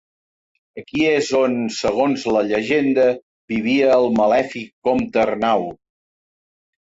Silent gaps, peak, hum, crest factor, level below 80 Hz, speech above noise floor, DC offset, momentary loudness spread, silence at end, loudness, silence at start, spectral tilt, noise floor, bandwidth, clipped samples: 3.22-3.48 s, 4.73-4.82 s; -4 dBFS; none; 14 dB; -54 dBFS; over 72 dB; under 0.1%; 11 LU; 1.1 s; -18 LUFS; 0.75 s; -5 dB/octave; under -90 dBFS; 8 kHz; under 0.1%